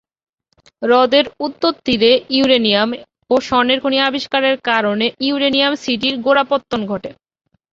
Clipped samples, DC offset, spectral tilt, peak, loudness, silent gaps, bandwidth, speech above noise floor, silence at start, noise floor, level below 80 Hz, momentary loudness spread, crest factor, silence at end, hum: under 0.1%; under 0.1%; -4.5 dB/octave; 0 dBFS; -15 LUFS; none; 7.6 kHz; 40 dB; 0.8 s; -55 dBFS; -54 dBFS; 9 LU; 16 dB; 0.6 s; none